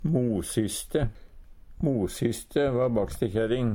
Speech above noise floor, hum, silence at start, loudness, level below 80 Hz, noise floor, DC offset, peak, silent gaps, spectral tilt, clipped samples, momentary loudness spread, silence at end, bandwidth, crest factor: 20 dB; none; 0 s; -28 LUFS; -44 dBFS; -47 dBFS; under 0.1%; -10 dBFS; none; -6 dB/octave; under 0.1%; 4 LU; 0 s; 17.5 kHz; 16 dB